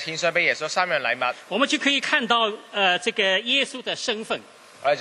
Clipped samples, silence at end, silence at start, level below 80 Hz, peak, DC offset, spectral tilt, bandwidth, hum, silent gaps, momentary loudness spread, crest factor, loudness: under 0.1%; 0 s; 0 s; -74 dBFS; -4 dBFS; under 0.1%; -2 dB/octave; 12 kHz; none; none; 7 LU; 20 dB; -22 LUFS